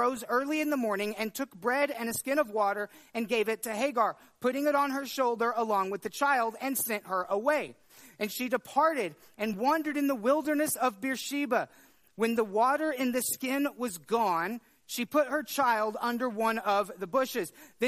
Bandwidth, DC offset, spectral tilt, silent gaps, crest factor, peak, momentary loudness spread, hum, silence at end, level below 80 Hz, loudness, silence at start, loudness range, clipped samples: 15.5 kHz; under 0.1%; -3.5 dB/octave; none; 16 dB; -14 dBFS; 8 LU; none; 0 s; -76 dBFS; -30 LUFS; 0 s; 1 LU; under 0.1%